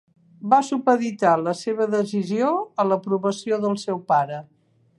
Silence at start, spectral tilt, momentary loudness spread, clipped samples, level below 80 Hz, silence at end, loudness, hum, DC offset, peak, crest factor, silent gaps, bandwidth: 0.4 s; -6 dB/octave; 6 LU; under 0.1%; -76 dBFS; 0.55 s; -22 LUFS; none; under 0.1%; -2 dBFS; 20 dB; none; 11.5 kHz